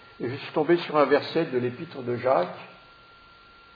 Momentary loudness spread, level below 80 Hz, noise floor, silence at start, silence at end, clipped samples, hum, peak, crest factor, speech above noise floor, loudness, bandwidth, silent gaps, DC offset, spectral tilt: 13 LU; -70 dBFS; -52 dBFS; 0.2 s; 1 s; under 0.1%; none; -6 dBFS; 20 dB; 27 dB; -26 LUFS; 5 kHz; none; under 0.1%; -8 dB/octave